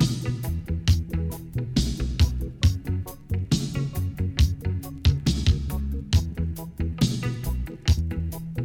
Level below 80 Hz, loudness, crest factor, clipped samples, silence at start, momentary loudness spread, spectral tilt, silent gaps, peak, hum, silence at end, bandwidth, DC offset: -30 dBFS; -26 LUFS; 16 dB; under 0.1%; 0 s; 7 LU; -6 dB/octave; none; -8 dBFS; none; 0 s; 17 kHz; under 0.1%